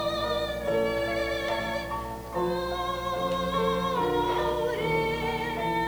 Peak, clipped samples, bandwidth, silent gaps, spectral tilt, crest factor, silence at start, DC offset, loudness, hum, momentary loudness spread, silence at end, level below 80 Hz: -14 dBFS; under 0.1%; over 20 kHz; none; -5 dB/octave; 14 dB; 0 s; under 0.1%; -28 LUFS; none; 4 LU; 0 s; -44 dBFS